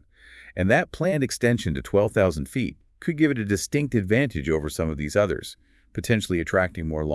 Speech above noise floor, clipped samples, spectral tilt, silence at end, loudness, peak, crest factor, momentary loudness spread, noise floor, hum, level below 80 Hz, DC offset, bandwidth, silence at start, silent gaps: 26 dB; under 0.1%; -6 dB/octave; 0 s; -24 LUFS; -4 dBFS; 20 dB; 10 LU; -49 dBFS; none; -44 dBFS; under 0.1%; 12 kHz; 0.35 s; none